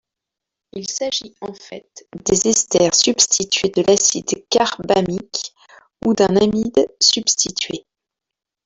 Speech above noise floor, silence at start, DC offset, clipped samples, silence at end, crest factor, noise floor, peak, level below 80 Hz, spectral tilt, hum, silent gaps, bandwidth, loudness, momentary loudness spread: 67 dB; 0.75 s; under 0.1%; under 0.1%; 0.85 s; 20 dB; -85 dBFS; 0 dBFS; -52 dBFS; -2.5 dB/octave; none; none; 8.2 kHz; -17 LUFS; 18 LU